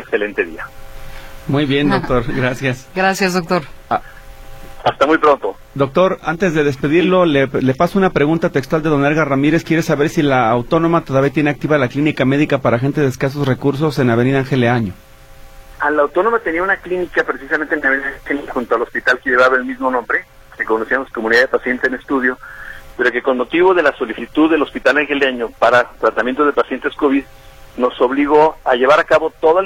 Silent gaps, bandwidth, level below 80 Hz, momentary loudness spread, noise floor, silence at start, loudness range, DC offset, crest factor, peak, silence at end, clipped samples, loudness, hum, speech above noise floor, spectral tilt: none; 16.5 kHz; -40 dBFS; 8 LU; -38 dBFS; 0 s; 3 LU; under 0.1%; 16 dB; 0 dBFS; 0 s; under 0.1%; -15 LUFS; none; 23 dB; -6.5 dB/octave